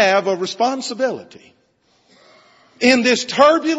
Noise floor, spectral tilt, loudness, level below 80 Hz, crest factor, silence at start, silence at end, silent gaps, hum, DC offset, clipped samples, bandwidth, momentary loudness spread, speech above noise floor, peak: -60 dBFS; -3 dB/octave; -16 LUFS; -62 dBFS; 18 dB; 0 s; 0 s; none; none; under 0.1%; under 0.1%; 10.5 kHz; 9 LU; 44 dB; 0 dBFS